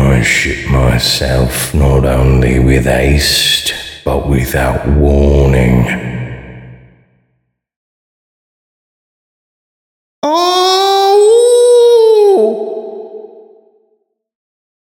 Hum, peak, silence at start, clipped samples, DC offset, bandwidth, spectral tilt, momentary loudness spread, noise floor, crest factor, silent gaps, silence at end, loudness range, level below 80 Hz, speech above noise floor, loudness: none; 0 dBFS; 0 s; under 0.1%; under 0.1%; 18.5 kHz; -5 dB/octave; 13 LU; -64 dBFS; 12 dB; 7.76-10.22 s; 1.6 s; 9 LU; -20 dBFS; 54 dB; -10 LUFS